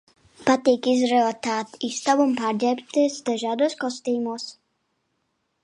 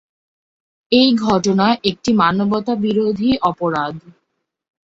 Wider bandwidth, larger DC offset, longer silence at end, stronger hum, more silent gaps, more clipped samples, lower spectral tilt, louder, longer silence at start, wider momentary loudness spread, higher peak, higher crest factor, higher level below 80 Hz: first, 11 kHz vs 7.8 kHz; neither; first, 1.1 s vs 0.85 s; neither; neither; neither; second, -3.5 dB/octave vs -5.5 dB/octave; second, -23 LUFS vs -16 LUFS; second, 0.4 s vs 0.9 s; about the same, 8 LU vs 7 LU; second, -6 dBFS vs 0 dBFS; about the same, 18 dB vs 18 dB; second, -72 dBFS vs -50 dBFS